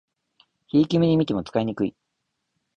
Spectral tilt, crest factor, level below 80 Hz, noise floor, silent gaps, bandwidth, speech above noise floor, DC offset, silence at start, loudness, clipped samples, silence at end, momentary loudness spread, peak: -8 dB/octave; 16 dB; -56 dBFS; -78 dBFS; none; 7.6 kHz; 57 dB; under 0.1%; 0.75 s; -23 LUFS; under 0.1%; 0.85 s; 8 LU; -8 dBFS